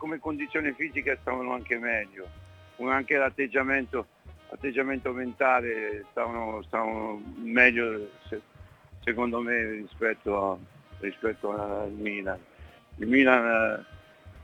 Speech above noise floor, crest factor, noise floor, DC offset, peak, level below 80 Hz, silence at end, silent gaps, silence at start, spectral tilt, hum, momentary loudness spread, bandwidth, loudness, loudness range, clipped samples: 22 dB; 26 dB; -50 dBFS; under 0.1%; -2 dBFS; -56 dBFS; 0 s; none; 0 s; -6.5 dB/octave; none; 16 LU; 9 kHz; -28 LUFS; 4 LU; under 0.1%